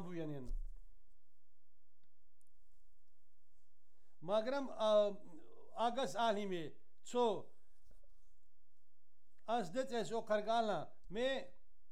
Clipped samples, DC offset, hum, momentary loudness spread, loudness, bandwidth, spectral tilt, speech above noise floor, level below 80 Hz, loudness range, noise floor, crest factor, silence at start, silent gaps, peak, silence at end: under 0.1%; 0.5%; none; 18 LU; -39 LUFS; 13 kHz; -5 dB/octave; 44 dB; -58 dBFS; 8 LU; -82 dBFS; 20 dB; 0 s; none; -22 dBFS; 0.4 s